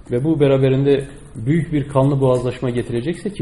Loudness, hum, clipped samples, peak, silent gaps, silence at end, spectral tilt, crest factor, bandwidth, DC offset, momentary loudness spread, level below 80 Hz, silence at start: -18 LUFS; none; under 0.1%; -2 dBFS; none; 0 s; -8.5 dB/octave; 16 dB; 11.5 kHz; 0.3%; 8 LU; -42 dBFS; 0.1 s